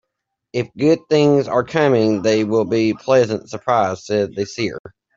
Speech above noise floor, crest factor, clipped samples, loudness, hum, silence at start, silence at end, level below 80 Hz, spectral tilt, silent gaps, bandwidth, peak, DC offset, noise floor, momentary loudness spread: 61 dB; 16 dB; under 0.1%; -18 LUFS; none; 0.55 s; 0.3 s; -58 dBFS; -6 dB/octave; 4.80-4.84 s; 7.6 kHz; -2 dBFS; under 0.1%; -78 dBFS; 10 LU